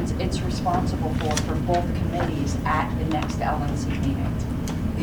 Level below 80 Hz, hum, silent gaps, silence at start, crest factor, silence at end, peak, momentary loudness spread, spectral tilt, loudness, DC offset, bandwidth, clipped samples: -32 dBFS; none; none; 0 s; 14 dB; 0 s; -10 dBFS; 3 LU; -6 dB/octave; -25 LUFS; under 0.1%; over 20 kHz; under 0.1%